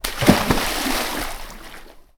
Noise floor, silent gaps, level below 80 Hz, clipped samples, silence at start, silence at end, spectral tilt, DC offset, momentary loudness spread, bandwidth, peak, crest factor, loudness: -41 dBFS; none; -32 dBFS; under 0.1%; 0.05 s; 0.2 s; -4 dB/octave; under 0.1%; 21 LU; over 20 kHz; 0 dBFS; 22 dB; -20 LUFS